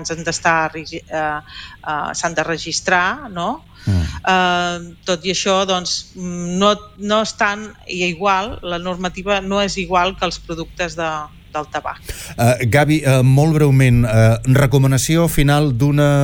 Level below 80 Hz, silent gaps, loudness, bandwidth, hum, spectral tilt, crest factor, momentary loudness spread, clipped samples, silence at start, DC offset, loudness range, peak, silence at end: -34 dBFS; none; -17 LUFS; 19.5 kHz; none; -5 dB/octave; 14 dB; 13 LU; under 0.1%; 0 s; under 0.1%; 7 LU; -2 dBFS; 0 s